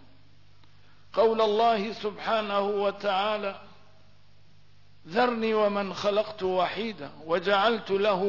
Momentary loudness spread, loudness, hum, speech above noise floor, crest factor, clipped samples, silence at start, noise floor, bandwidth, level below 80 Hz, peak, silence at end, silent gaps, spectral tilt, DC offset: 10 LU; -27 LUFS; 50 Hz at -60 dBFS; 34 dB; 16 dB; under 0.1%; 1.15 s; -60 dBFS; 6 kHz; -66 dBFS; -12 dBFS; 0 s; none; -5.5 dB/octave; 0.3%